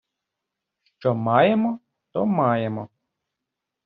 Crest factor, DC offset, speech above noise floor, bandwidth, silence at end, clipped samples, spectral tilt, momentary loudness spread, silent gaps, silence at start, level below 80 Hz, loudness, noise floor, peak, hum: 22 dB; under 0.1%; 63 dB; 5.2 kHz; 1 s; under 0.1%; -6 dB/octave; 16 LU; none; 1 s; -66 dBFS; -22 LUFS; -84 dBFS; -4 dBFS; none